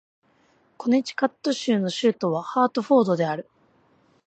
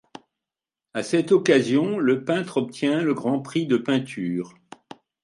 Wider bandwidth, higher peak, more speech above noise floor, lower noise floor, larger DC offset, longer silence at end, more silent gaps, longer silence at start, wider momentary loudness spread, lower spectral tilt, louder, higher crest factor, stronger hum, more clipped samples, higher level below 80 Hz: second, 8.8 kHz vs 11.5 kHz; about the same, -6 dBFS vs -4 dBFS; second, 40 dB vs 67 dB; second, -62 dBFS vs -89 dBFS; neither; about the same, 0.85 s vs 0.75 s; neither; second, 0.8 s vs 0.95 s; second, 7 LU vs 10 LU; about the same, -5.5 dB/octave vs -6 dB/octave; about the same, -23 LUFS vs -23 LUFS; about the same, 18 dB vs 20 dB; neither; neither; about the same, -76 dBFS vs -72 dBFS